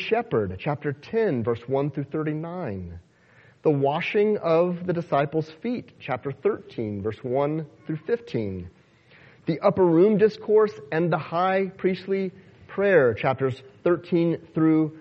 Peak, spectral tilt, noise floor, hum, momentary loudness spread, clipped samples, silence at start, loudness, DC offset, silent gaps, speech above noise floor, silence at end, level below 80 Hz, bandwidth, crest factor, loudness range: -6 dBFS; -9 dB/octave; -56 dBFS; none; 13 LU; under 0.1%; 0 s; -25 LUFS; under 0.1%; none; 32 dB; 0 s; -60 dBFS; 6.4 kHz; 18 dB; 6 LU